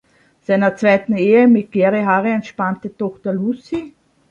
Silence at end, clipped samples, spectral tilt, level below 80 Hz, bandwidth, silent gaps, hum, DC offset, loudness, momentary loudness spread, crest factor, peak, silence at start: 0.45 s; under 0.1%; -8 dB/octave; -60 dBFS; 7.2 kHz; none; none; under 0.1%; -16 LUFS; 13 LU; 16 dB; -2 dBFS; 0.5 s